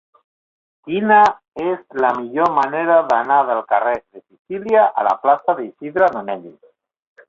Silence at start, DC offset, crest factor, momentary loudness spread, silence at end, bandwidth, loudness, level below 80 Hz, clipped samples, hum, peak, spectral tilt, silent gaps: 0.85 s; under 0.1%; 16 dB; 12 LU; 0.8 s; 7.4 kHz; -17 LUFS; -62 dBFS; under 0.1%; none; -2 dBFS; -6.5 dB/octave; 1.48-1.52 s, 4.39-4.45 s